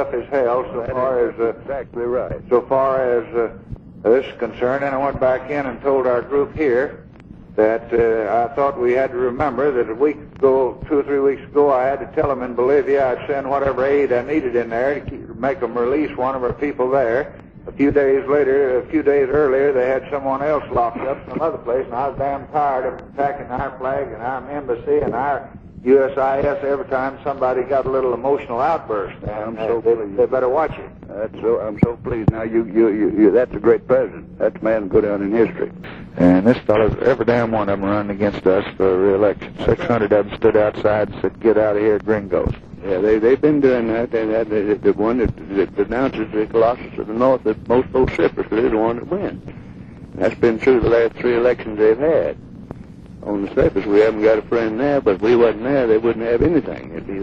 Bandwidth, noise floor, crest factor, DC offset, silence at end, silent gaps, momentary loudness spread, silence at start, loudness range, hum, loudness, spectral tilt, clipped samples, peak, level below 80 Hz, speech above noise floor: 6.6 kHz; -40 dBFS; 16 dB; under 0.1%; 0 s; none; 10 LU; 0 s; 3 LU; none; -18 LUFS; -9 dB/octave; under 0.1%; -2 dBFS; -42 dBFS; 22 dB